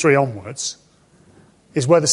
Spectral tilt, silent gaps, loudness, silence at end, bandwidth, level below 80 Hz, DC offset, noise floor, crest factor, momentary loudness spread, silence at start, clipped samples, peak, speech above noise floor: -4 dB/octave; none; -20 LUFS; 0 s; 11.5 kHz; -58 dBFS; under 0.1%; -53 dBFS; 18 dB; 11 LU; 0 s; under 0.1%; -2 dBFS; 36 dB